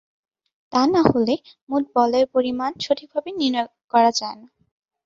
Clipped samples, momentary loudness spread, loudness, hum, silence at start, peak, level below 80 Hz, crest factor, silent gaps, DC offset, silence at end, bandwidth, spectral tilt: under 0.1%; 9 LU; -21 LUFS; none; 0.7 s; 0 dBFS; -56 dBFS; 22 dB; 1.62-1.67 s, 3.84-3.88 s; under 0.1%; 0.7 s; 7.8 kHz; -5 dB/octave